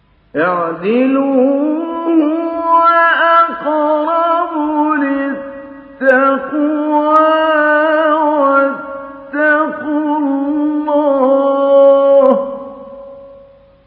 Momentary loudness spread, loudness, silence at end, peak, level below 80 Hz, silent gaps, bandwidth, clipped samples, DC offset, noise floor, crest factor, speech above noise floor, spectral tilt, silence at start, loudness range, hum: 15 LU; -12 LUFS; 0.55 s; 0 dBFS; -58 dBFS; none; 4.7 kHz; under 0.1%; under 0.1%; -42 dBFS; 12 dB; 29 dB; -7.5 dB/octave; 0.35 s; 2 LU; none